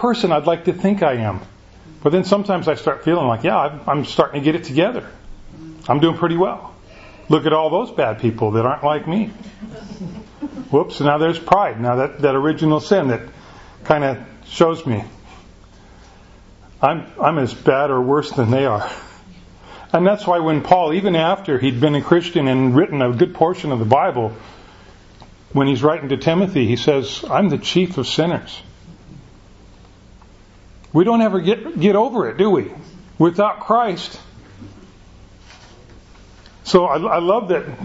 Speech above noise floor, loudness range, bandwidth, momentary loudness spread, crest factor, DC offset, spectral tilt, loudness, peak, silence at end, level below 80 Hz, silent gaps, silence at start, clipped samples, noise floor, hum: 28 dB; 5 LU; 8 kHz; 14 LU; 18 dB; under 0.1%; -7 dB/octave; -17 LUFS; 0 dBFS; 0 s; -48 dBFS; none; 0 s; under 0.1%; -45 dBFS; none